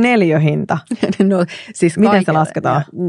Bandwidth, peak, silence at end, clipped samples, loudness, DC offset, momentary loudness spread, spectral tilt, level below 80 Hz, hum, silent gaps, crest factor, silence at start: 11 kHz; 0 dBFS; 0 s; under 0.1%; -15 LUFS; under 0.1%; 8 LU; -7 dB/octave; -56 dBFS; none; none; 14 dB; 0 s